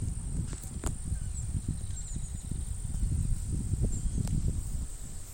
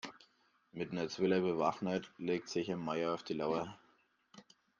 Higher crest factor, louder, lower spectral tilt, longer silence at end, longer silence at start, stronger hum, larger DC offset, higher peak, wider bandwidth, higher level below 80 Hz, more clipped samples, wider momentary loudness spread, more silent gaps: about the same, 16 dB vs 20 dB; about the same, -36 LUFS vs -37 LUFS; about the same, -6 dB/octave vs -6 dB/octave; second, 0 s vs 0.4 s; about the same, 0 s vs 0.05 s; neither; neither; about the same, -16 dBFS vs -18 dBFS; first, 17 kHz vs 7.4 kHz; first, -34 dBFS vs -76 dBFS; neither; second, 6 LU vs 11 LU; neither